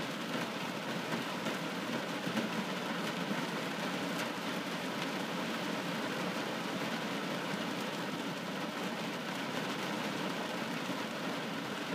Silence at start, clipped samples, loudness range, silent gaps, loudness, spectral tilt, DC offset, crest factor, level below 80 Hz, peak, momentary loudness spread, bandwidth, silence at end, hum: 0 s; under 0.1%; 1 LU; none; -37 LUFS; -4 dB/octave; under 0.1%; 16 dB; -82 dBFS; -20 dBFS; 2 LU; 15.5 kHz; 0 s; none